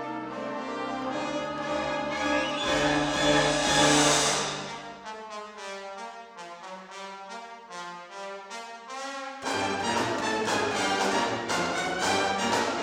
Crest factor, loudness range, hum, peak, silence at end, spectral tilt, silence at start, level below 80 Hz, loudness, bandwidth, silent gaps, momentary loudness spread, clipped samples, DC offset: 20 dB; 16 LU; none; -8 dBFS; 0 s; -2.5 dB/octave; 0 s; -54 dBFS; -26 LUFS; 18 kHz; none; 18 LU; under 0.1%; under 0.1%